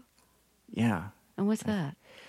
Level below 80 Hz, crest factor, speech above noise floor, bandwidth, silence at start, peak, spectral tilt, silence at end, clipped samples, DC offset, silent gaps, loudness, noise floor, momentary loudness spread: -66 dBFS; 16 dB; 36 dB; 14.5 kHz; 0.7 s; -18 dBFS; -6.5 dB/octave; 0 s; under 0.1%; under 0.1%; none; -32 LUFS; -67 dBFS; 11 LU